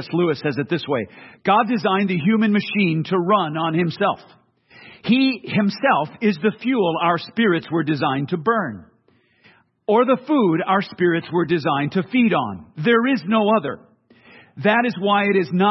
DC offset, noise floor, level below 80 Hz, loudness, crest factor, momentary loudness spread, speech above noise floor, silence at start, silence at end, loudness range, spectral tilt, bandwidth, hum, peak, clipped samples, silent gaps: under 0.1%; -60 dBFS; -66 dBFS; -20 LUFS; 18 dB; 6 LU; 41 dB; 0 s; 0 s; 2 LU; -8.5 dB/octave; 6 kHz; none; -2 dBFS; under 0.1%; none